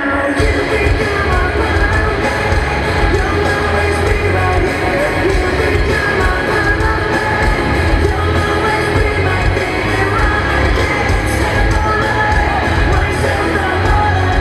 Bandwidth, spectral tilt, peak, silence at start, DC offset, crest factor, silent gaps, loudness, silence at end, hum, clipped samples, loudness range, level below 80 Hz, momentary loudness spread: 13 kHz; -6 dB/octave; 0 dBFS; 0 s; under 0.1%; 12 dB; none; -14 LUFS; 0 s; none; under 0.1%; 0 LU; -20 dBFS; 1 LU